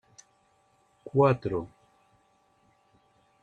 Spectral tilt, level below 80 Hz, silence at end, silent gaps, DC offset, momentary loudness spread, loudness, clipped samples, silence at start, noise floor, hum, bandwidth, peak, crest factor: -8.5 dB/octave; -64 dBFS; 1.75 s; none; under 0.1%; 23 LU; -27 LUFS; under 0.1%; 1.05 s; -67 dBFS; none; 8.6 kHz; -10 dBFS; 22 dB